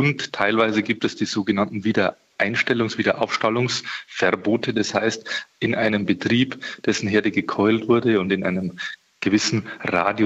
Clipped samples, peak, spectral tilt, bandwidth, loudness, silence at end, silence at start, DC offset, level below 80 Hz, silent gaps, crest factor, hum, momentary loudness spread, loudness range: under 0.1%; -4 dBFS; -5 dB/octave; 8.2 kHz; -22 LUFS; 0 s; 0 s; under 0.1%; -60 dBFS; none; 16 dB; none; 6 LU; 1 LU